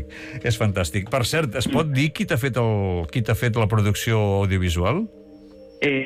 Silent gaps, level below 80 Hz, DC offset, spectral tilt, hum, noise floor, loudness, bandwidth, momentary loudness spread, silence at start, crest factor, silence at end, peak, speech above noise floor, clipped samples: none; -42 dBFS; under 0.1%; -5.5 dB/octave; none; -44 dBFS; -22 LUFS; 16 kHz; 4 LU; 0 s; 12 dB; 0 s; -10 dBFS; 23 dB; under 0.1%